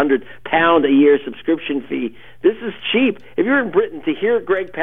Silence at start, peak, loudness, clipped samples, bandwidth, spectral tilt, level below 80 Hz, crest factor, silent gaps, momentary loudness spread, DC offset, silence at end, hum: 0 s; -2 dBFS; -17 LUFS; under 0.1%; 3.8 kHz; -8 dB/octave; -54 dBFS; 16 dB; none; 10 LU; 1%; 0 s; none